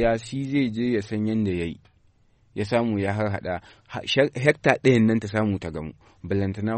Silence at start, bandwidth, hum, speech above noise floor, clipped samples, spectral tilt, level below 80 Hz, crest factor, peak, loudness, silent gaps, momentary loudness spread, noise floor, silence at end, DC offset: 0 s; 8.8 kHz; none; 36 dB; under 0.1%; -6.5 dB/octave; -48 dBFS; 22 dB; -2 dBFS; -24 LUFS; none; 14 LU; -60 dBFS; 0 s; under 0.1%